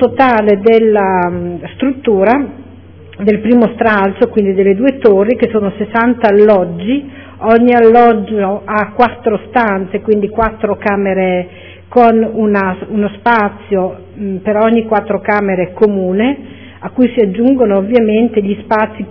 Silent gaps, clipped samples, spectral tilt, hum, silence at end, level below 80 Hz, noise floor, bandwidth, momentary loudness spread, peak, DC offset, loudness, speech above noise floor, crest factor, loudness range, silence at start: none; 0.7%; -9.5 dB/octave; none; 0 s; -42 dBFS; -35 dBFS; 5.4 kHz; 9 LU; 0 dBFS; 0.4%; -12 LUFS; 24 dB; 12 dB; 4 LU; 0 s